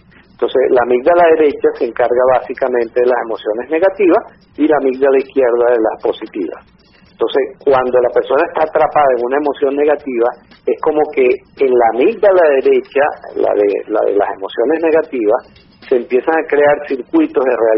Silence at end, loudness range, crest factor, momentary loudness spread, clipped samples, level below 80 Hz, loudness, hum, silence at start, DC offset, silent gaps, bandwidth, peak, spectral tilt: 0 s; 2 LU; 12 dB; 7 LU; under 0.1%; -52 dBFS; -14 LUFS; none; 0.4 s; under 0.1%; none; 5.6 kHz; 0 dBFS; -3.5 dB/octave